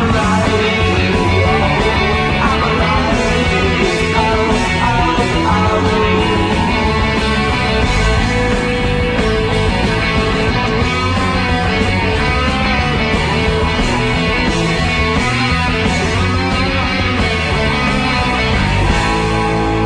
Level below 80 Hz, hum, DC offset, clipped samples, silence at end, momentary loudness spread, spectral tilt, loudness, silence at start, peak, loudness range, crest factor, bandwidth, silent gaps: -22 dBFS; none; under 0.1%; under 0.1%; 0 s; 2 LU; -5.5 dB/octave; -14 LUFS; 0 s; 0 dBFS; 1 LU; 12 dB; 10.5 kHz; none